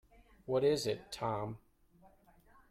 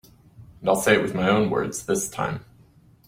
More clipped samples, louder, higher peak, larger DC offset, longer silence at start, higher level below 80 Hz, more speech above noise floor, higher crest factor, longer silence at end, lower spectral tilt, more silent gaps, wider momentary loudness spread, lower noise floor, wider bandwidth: neither; second, -36 LUFS vs -23 LUFS; second, -20 dBFS vs -4 dBFS; neither; about the same, 0.5 s vs 0.4 s; second, -66 dBFS vs -54 dBFS; about the same, 30 dB vs 32 dB; about the same, 18 dB vs 22 dB; first, 1.15 s vs 0.7 s; about the same, -5 dB/octave vs -4.5 dB/octave; neither; first, 18 LU vs 10 LU; first, -65 dBFS vs -54 dBFS; about the same, 15.5 kHz vs 16.5 kHz